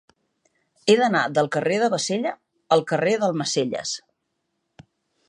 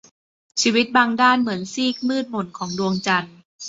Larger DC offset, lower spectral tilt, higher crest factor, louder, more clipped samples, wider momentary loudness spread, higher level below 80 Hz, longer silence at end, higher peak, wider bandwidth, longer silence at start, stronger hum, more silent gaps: neither; about the same, -4 dB/octave vs -3.5 dB/octave; about the same, 20 dB vs 20 dB; about the same, -22 LUFS vs -20 LUFS; neither; about the same, 11 LU vs 12 LU; second, -72 dBFS vs -64 dBFS; first, 1.3 s vs 0 s; about the same, -4 dBFS vs -2 dBFS; first, 11 kHz vs 8 kHz; first, 0.85 s vs 0.55 s; neither; second, none vs 3.45-3.59 s